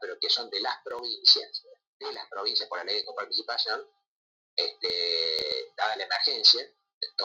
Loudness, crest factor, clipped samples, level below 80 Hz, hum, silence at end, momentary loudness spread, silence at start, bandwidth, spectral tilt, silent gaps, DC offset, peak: -25 LUFS; 24 dB; under 0.1%; -76 dBFS; none; 0 s; 17 LU; 0 s; 16.5 kHz; 0.5 dB/octave; 1.87-2.00 s, 4.07-4.57 s, 6.94-7.01 s; under 0.1%; -6 dBFS